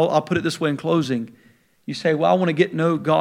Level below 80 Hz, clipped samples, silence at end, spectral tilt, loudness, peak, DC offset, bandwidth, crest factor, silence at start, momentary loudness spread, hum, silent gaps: -62 dBFS; under 0.1%; 0 s; -6.5 dB/octave; -21 LUFS; -4 dBFS; under 0.1%; 15 kHz; 18 dB; 0 s; 11 LU; none; none